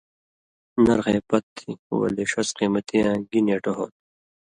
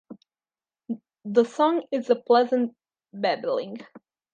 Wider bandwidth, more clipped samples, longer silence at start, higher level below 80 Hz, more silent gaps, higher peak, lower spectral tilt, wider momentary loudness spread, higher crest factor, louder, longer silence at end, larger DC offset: first, 11 kHz vs 8.6 kHz; neither; first, 0.75 s vs 0.1 s; first, -54 dBFS vs -82 dBFS; first, 1.43-1.56 s, 1.79-1.90 s vs none; about the same, -6 dBFS vs -6 dBFS; about the same, -5.5 dB/octave vs -5.5 dB/octave; second, 11 LU vs 16 LU; about the same, 18 dB vs 20 dB; about the same, -23 LUFS vs -24 LUFS; first, 0.7 s vs 0.35 s; neither